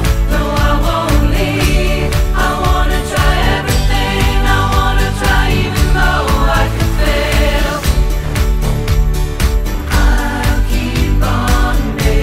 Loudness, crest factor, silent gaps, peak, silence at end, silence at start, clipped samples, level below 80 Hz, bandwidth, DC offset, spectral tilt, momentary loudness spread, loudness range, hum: -14 LUFS; 12 dB; none; 0 dBFS; 0 s; 0 s; under 0.1%; -14 dBFS; 16 kHz; under 0.1%; -5 dB/octave; 3 LU; 2 LU; none